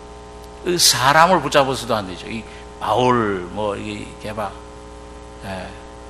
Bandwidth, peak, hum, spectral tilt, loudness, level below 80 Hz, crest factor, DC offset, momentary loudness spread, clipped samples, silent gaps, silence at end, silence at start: 15.5 kHz; 0 dBFS; 60 Hz at -40 dBFS; -3 dB/octave; -17 LUFS; -42 dBFS; 20 dB; 0.1%; 25 LU; under 0.1%; none; 0 s; 0 s